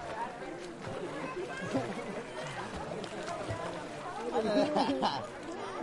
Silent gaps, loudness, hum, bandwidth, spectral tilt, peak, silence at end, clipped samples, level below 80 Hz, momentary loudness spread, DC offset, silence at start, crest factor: none; -36 LUFS; none; 11.5 kHz; -5 dB/octave; -16 dBFS; 0 s; under 0.1%; -62 dBFS; 11 LU; under 0.1%; 0 s; 20 dB